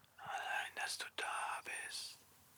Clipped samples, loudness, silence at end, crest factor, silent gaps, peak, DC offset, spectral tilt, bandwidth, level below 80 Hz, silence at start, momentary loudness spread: under 0.1%; -43 LUFS; 0 s; 18 dB; none; -26 dBFS; under 0.1%; 0.5 dB/octave; over 20 kHz; -88 dBFS; 0.15 s; 6 LU